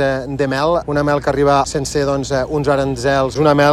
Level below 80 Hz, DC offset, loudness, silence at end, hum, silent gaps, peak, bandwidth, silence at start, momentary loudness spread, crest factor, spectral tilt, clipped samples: -36 dBFS; under 0.1%; -16 LUFS; 0 s; none; none; -2 dBFS; 14 kHz; 0 s; 5 LU; 14 dB; -5.5 dB/octave; under 0.1%